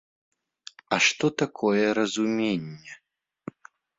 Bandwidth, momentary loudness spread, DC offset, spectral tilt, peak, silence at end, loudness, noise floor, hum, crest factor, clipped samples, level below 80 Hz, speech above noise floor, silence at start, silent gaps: 7.8 kHz; 23 LU; under 0.1%; -4 dB/octave; -6 dBFS; 1 s; -24 LUFS; -50 dBFS; none; 22 dB; under 0.1%; -68 dBFS; 25 dB; 0.9 s; none